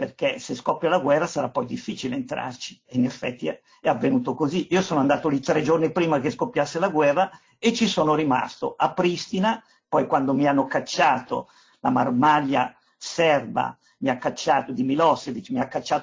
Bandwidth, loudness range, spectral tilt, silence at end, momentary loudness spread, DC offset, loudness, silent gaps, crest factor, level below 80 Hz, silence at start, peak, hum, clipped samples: 7.6 kHz; 4 LU; -5.5 dB/octave; 0 s; 9 LU; under 0.1%; -23 LUFS; none; 18 dB; -64 dBFS; 0 s; -6 dBFS; none; under 0.1%